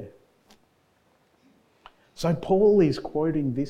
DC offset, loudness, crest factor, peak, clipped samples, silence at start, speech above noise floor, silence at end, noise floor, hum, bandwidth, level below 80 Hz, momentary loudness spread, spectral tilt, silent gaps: under 0.1%; -23 LUFS; 16 dB; -10 dBFS; under 0.1%; 0 s; 43 dB; 0 s; -65 dBFS; none; 13 kHz; -52 dBFS; 10 LU; -8 dB/octave; none